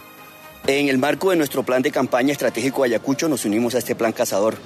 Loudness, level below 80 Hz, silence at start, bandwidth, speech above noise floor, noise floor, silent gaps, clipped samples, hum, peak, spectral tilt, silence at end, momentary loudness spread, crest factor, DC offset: -20 LUFS; -64 dBFS; 0 s; 14 kHz; 22 dB; -42 dBFS; none; under 0.1%; none; -6 dBFS; -4.5 dB/octave; 0 s; 3 LU; 14 dB; under 0.1%